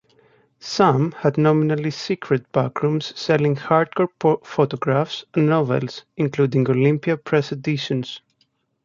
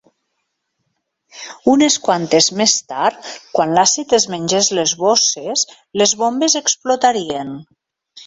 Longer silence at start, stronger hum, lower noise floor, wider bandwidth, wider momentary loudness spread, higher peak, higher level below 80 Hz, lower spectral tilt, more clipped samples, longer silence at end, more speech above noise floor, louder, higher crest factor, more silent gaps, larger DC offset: second, 0.65 s vs 1.35 s; neither; second, -67 dBFS vs -72 dBFS; second, 7.4 kHz vs 8.2 kHz; about the same, 8 LU vs 10 LU; about the same, -2 dBFS vs 0 dBFS; about the same, -62 dBFS vs -60 dBFS; first, -7 dB/octave vs -2 dB/octave; neither; first, 0.65 s vs 0.05 s; second, 47 dB vs 57 dB; second, -20 LUFS vs -15 LUFS; about the same, 18 dB vs 18 dB; neither; neither